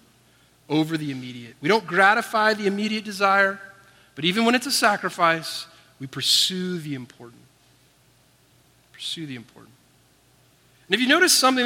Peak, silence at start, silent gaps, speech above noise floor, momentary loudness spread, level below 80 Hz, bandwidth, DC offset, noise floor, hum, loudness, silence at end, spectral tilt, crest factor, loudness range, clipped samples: -4 dBFS; 0.7 s; none; 37 dB; 18 LU; -72 dBFS; 16.5 kHz; under 0.1%; -59 dBFS; none; -21 LUFS; 0 s; -2.5 dB/octave; 20 dB; 18 LU; under 0.1%